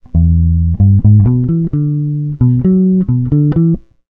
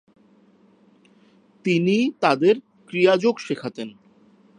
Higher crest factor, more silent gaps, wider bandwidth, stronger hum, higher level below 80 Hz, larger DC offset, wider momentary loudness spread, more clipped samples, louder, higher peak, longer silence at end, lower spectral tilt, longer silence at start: second, 10 dB vs 20 dB; neither; second, 2 kHz vs 10 kHz; neither; first, -22 dBFS vs -74 dBFS; neither; second, 6 LU vs 14 LU; neither; first, -12 LUFS vs -21 LUFS; first, 0 dBFS vs -4 dBFS; second, 0.3 s vs 0.7 s; first, -14.5 dB/octave vs -6 dB/octave; second, 0.15 s vs 1.65 s